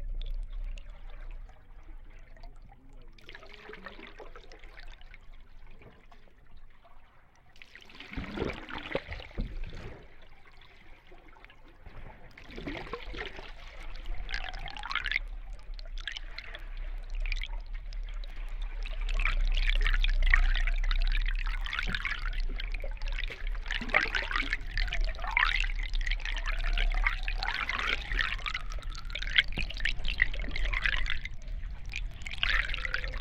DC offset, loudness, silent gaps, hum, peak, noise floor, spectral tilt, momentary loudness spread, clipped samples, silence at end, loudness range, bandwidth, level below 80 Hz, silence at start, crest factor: under 0.1%; -34 LUFS; none; none; -6 dBFS; -56 dBFS; -4 dB/octave; 23 LU; under 0.1%; 0 s; 19 LU; 7.8 kHz; -34 dBFS; 0 s; 26 dB